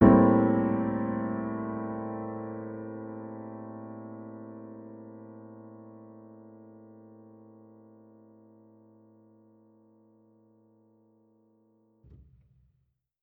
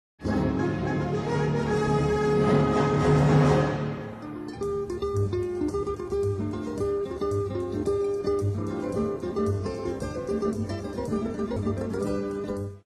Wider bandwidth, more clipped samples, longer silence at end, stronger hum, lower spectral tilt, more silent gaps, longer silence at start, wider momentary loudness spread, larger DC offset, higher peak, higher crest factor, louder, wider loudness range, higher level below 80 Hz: second, 3.4 kHz vs 12 kHz; neither; first, 6.15 s vs 0.05 s; neither; first, -10 dB/octave vs -7.5 dB/octave; neither; second, 0 s vs 0.2 s; first, 27 LU vs 10 LU; neither; first, -4 dBFS vs -10 dBFS; first, 26 dB vs 16 dB; second, -30 LUFS vs -27 LUFS; first, 25 LU vs 6 LU; second, -56 dBFS vs -44 dBFS